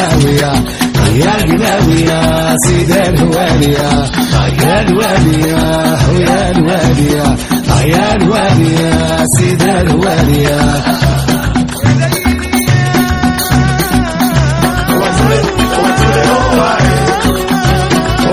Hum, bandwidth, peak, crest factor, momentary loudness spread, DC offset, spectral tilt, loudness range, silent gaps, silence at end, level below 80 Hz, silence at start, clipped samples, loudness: none; over 20 kHz; 0 dBFS; 10 dB; 3 LU; under 0.1%; -5.5 dB/octave; 1 LU; none; 0 s; -22 dBFS; 0 s; 0.2%; -10 LUFS